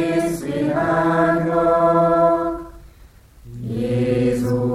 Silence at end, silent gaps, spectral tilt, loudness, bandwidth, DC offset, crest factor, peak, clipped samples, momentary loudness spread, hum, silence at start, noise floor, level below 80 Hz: 0 s; none; -7.5 dB/octave; -18 LUFS; 15 kHz; under 0.1%; 14 dB; -4 dBFS; under 0.1%; 10 LU; none; 0 s; -46 dBFS; -44 dBFS